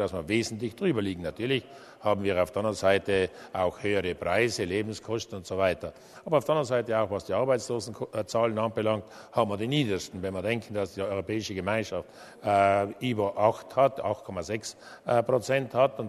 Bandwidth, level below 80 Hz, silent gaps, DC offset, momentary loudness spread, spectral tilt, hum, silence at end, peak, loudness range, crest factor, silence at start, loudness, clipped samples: 13.5 kHz; -60 dBFS; none; under 0.1%; 9 LU; -5.5 dB/octave; none; 0 s; -8 dBFS; 2 LU; 20 dB; 0 s; -28 LUFS; under 0.1%